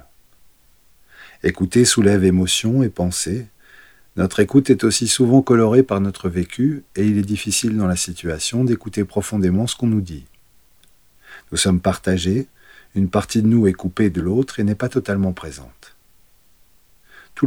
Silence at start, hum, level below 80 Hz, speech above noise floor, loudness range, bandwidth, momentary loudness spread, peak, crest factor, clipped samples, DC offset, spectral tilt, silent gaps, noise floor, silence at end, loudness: 1.2 s; none; -48 dBFS; 38 dB; 6 LU; 17.5 kHz; 10 LU; -2 dBFS; 18 dB; under 0.1%; 0.2%; -5 dB/octave; none; -56 dBFS; 0 s; -18 LUFS